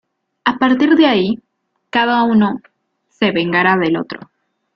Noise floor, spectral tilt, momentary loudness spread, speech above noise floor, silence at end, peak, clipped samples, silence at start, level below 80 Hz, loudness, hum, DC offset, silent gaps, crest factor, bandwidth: -64 dBFS; -7 dB/octave; 12 LU; 50 dB; 0.6 s; -2 dBFS; under 0.1%; 0.45 s; -58 dBFS; -15 LUFS; none; under 0.1%; none; 14 dB; 6.4 kHz